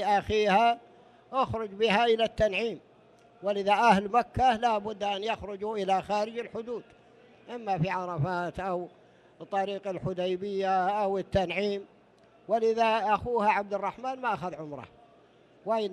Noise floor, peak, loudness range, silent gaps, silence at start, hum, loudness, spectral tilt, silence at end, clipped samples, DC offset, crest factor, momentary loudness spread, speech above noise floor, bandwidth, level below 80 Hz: -59 dBFS; -10 dBFS; 6 LU; none; 0 s; none; -28 LUFS; -5.5 dB/octave; 0 s; under 0.1%; under 0.1%; 20 dB; 13 LU; 31 dB; 12 kHz; -56 dBFS